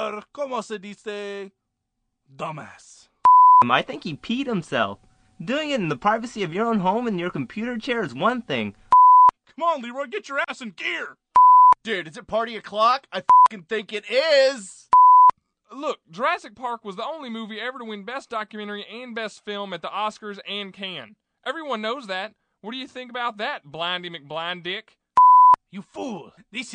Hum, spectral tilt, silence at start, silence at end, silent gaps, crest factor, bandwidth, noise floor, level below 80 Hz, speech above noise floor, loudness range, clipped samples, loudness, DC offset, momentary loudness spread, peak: none; -4.5 dB/octave; 0 s; 0 s; none; 18 dB; 9.4 kHz; -77 dBFS; -64 dBFS; 52 dB; 13 LU; under 0.1%; -19 LUFS; under 0.1%; 20 LU; -4 dBFS